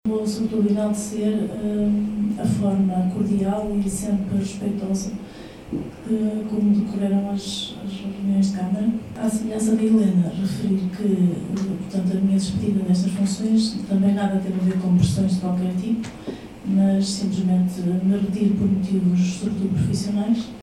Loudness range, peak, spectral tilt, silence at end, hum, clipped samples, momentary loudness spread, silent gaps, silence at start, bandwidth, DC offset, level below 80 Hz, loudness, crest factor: 3 LU; -6 dBFS; -7 dB/octave; 0 s; none; under 0.1%; 7 LU; none; 0.05 s; 12.5 kHz; under 0.1%; -48 dBFS; -22 LUFS; 16 dB